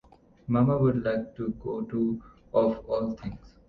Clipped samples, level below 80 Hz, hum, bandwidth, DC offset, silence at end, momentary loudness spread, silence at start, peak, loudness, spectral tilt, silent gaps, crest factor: under 0.1%; -52 dBFS; none; 5.8 kHz; under 0.1%; 0.2 s; 14 LU; 0.5 s; -10 dBFS; -28 LUFS; -10.5 dB/octave; none; 18 dB